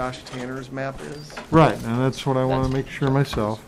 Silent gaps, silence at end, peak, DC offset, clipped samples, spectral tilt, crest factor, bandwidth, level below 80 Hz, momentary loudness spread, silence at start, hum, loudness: none; 0 s; -6 dBFS; under 0.1%; under 0.1%; -7 dB/octave; 16 dB; 14.5 kHz; -42 dBFS; 15 LU; 0 s; none; -23 LUFS